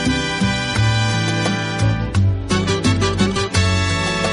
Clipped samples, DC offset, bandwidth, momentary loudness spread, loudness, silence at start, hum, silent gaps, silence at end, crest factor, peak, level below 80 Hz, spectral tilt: under 0.1%; under 0.1%; 11.5 kHz; 2 LU; -18 LUFS; 0 s; none; none; 0 s; 14 dB; -2 dBFS; -32 dBFS; -5 dB/octave